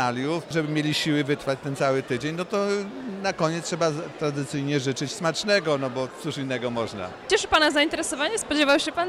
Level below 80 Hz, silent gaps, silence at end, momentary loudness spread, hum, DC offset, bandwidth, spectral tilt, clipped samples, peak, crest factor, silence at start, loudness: -56 dBFS; none; 0 s; 9 LU; none; under 0.1%; 15 kHz; -4 dB/octave; under 0.1%; -8 dBFS; 16 dB; 0 s; -25 LUFS